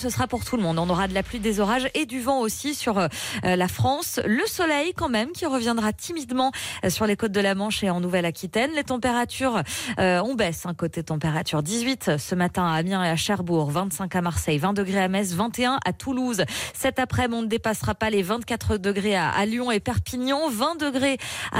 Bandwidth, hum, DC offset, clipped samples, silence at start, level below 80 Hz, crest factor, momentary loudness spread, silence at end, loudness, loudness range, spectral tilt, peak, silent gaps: 16 kHz; none; under 0.1%; under 0.1%; 0 s; -46 dBFS; 14 dB; 4 LU; 0 s; -24 LUFS; 1 LU; -4.5 dB/octave; -12 dBFS; none